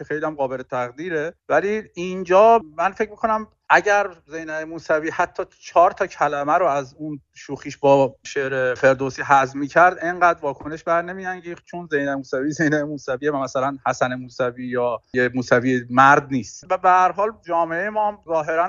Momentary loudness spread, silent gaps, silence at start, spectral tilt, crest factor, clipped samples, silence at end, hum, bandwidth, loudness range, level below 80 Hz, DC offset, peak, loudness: 13 LU; none; 0 s; -4 dB/octave; 20 dB; under 0.1%; 0 s; none; 7.6 kHz; 5 LU; -58 dBFS; under 0.1%; 0 dBFS; -20 LUFS